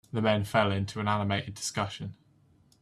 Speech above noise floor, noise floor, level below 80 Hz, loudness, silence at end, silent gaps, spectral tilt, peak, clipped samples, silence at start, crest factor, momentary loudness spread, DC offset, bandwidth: 34 dB; -63 dBFS; -64 dBFS; -29 LUFS; 0.7 s; none; -5 dB/octave; -10 dBFS; under 0.1%; 0.15 s; 20 dB; 9 LU; under 0.1%; 13.5 kHz